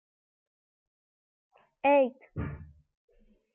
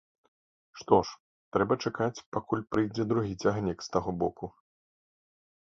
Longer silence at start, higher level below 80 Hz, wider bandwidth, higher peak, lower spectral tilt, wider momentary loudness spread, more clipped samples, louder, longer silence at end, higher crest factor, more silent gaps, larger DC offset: first, 1.85 s vs 0.75 s; about the same, -58 dBFS vs -58 dBFS; second, 3.9 kHz vs 7.6 kHz; second, -16 dBFS vs -6 dBFS; first, -10 dB/octave vs -6.5 dB/octave; first, 16 LU vs 12 LU; neither; about the same, -29 LUFS vs -30 LUFS; second, 0.9 s vs 1.3 s; second, 18 dB vs 24 dB; second, none vs 1.20-1.52 s, 2.26-2.32 s; neither